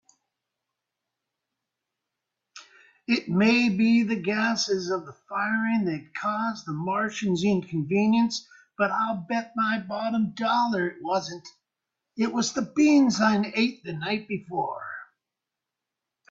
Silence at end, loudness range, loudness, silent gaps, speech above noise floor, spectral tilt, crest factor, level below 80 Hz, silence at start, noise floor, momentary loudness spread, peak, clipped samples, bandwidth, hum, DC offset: 1.25 s; 3 LU; -25 LUFS; none; 62 dB; -5 dB/octave; 18 dB; -68 dBFS; 2.55 s; -87 dBFS; 11 LU; -8 dBFS; under 0.1%; 7.8 kHz; none; under 0.1%